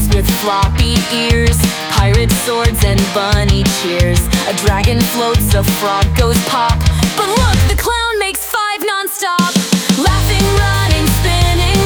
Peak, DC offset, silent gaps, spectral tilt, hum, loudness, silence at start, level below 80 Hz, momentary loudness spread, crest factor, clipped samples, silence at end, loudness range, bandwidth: 0 dBFS; under 0.1%; none; -4.5 dB/octave; none; -13 LUFS; 0 s; -18 dBFS; 3 LU; 12 dB; under 0.1%; 0 s; 1 LU; over 20 kHz